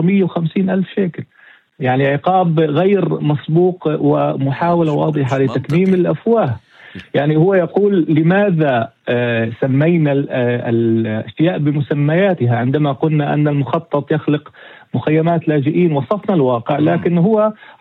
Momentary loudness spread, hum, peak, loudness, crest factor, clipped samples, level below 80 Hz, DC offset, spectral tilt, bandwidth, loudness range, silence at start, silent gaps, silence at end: 6 LU; none; -2 dBFS; -15 LUFS; 14 dB; under 0.1%; -58 dBFS; under 0.1%; -9.5 dB/octave; 4.5 kHz; 2 LU; 0 s; none; 0.25 s